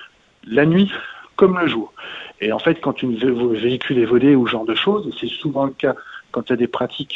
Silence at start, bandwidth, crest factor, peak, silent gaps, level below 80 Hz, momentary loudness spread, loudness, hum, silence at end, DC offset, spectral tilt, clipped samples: 0 s; 7.2 kHz; 18 dB; 0 dBFS; none; -56 dBFS; 13 LU; -18 LUFS; none; 0 s; under 0.1%; -8 dB/octave; under 0.1%